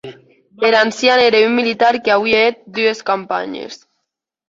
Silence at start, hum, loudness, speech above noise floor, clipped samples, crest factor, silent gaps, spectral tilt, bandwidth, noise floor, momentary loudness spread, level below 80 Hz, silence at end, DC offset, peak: 0.05 s; none; -14 LUFS; 61 dB; under 0.1%; 16 dB; none; -3.5 dB/octave; 7.8 kHz; -76 dBFS; 11 LU; -58 dBFS; 0.75 s; under 0.1%; 0 dBFS